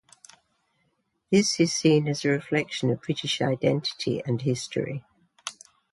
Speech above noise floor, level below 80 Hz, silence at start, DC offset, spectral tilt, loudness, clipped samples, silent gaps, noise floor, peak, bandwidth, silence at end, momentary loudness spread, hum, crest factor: 48 dB; -66 dBFS; 1.3 s; under 0.1%; -5 dB/octave; -25 LUFS; under 0.1%; none; -73 dBFS; -8 dBFS; 11.5 kHz; 0.4 s; 16 LU; none; 18 dB